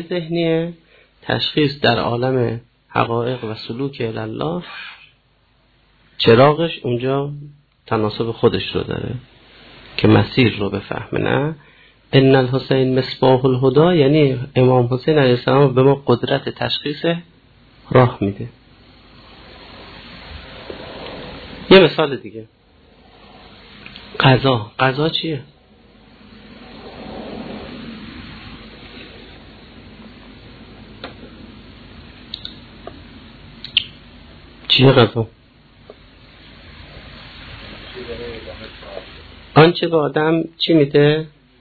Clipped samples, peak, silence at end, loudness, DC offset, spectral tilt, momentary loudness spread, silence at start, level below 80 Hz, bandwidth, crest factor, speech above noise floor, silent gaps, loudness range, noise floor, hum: under 0.1%; 0 dBFS; 0.35 s; -16 LUFS; under 0.1%; -9 dB/octave; 24 LU; 0 s; -46 dBFS; 4.8 kHz; 18 dB; 42 dB; none; 20 LU; -58 dBFS; none